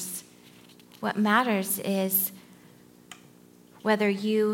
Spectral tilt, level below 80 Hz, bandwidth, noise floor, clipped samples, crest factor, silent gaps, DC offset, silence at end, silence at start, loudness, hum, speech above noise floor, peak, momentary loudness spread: -4 dB/octave; -80 dBFS; 17 kHz; -54 dBFS; under 0.1%; 20 dB; none; under 0.1%; 0 s; 0 s; -26 LUFS; none; 29 dB; -8 dBFS; 11 LU